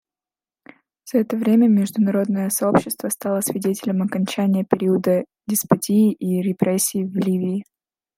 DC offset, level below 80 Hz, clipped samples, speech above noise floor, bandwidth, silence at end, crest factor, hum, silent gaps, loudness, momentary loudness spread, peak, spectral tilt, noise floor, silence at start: under 0.1%; -62 dBFS; under 0.1%; over 71 dB; 16.5 kHz; 0.55 s; 18 dB; none; none; -20 LUFS; 6 LU; -2 dBFS; -6 dB/octave; under -90 dBFS; 1.05 s